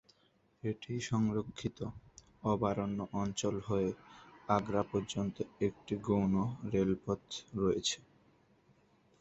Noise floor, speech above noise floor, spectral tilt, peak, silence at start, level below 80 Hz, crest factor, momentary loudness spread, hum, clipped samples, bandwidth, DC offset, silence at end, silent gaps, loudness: -72 dBFS; 37 dB; -6 dB/octave; -14 dBFS; 0.65 s; -60 dBFS; 22 dB; 10 LU; none; under 0.1%; 8.4 kHz; under 0.1%; 1.2 s; none; -36 LUFS